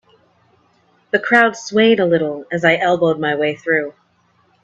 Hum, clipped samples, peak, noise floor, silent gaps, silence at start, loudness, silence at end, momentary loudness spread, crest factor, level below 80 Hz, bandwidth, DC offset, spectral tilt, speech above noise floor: none; under 0.1%; 0 dBFS; -59 dBFS; none; 1.15 s; -16 LUFS; 0.75 s; 7 LU; 18 dB; -62 dBFS; 8.2 kHz; under 0.1%; -5 dB/octave; 43 dB